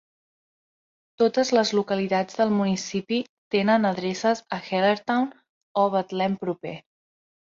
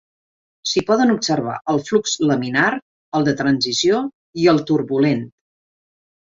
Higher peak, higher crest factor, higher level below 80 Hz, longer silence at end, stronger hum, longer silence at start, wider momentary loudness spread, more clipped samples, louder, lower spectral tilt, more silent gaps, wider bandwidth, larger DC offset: second, -8 dBFS vs -2 dBFS; about the same, 18 dB vs 16 dB; second, -68 dBFS vs -58 dBFS; second, 0.8 s vs 1 s; neither; first, 1.2 s vs 0.65 s; about the same, 9 LU vs 9 LU; neither; second, -24 LUFS vs -18 LUFS; about the same, -5 dB/octave vs -4.5 dB/octave; about the same, 3.29-3.51 s, 5.49-5.75 s vs 2.82-3.12 s, 4.14-4.33 s; about the same, 7.6 kHz vs 7.8 kHz; neither